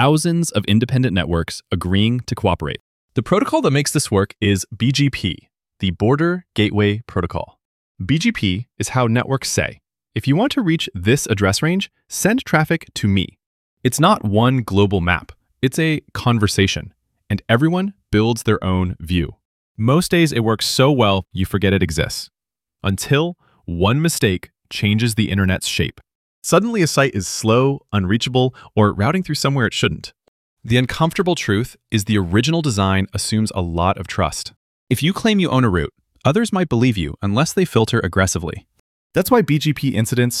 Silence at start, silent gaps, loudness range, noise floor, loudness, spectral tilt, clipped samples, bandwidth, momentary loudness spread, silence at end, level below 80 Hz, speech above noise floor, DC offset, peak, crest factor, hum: 0 s; 2.80-3.08 s, 7.65-7.95 s, 13.46-13.77 s, 19.45-19.75 s, 26.15-26.42 s, 30.28-30.57 s, 34.56-34.87 s, 38.80-39.10 s; 2 LU; -49 dBFS; -18 LUFS; -5 dB/octave; under 0.1%; 15.5 kHz; 8 LU; 0 s; -42 dBFS; 31 dB; under 0.1%; -2 dBFS; 18 dB; none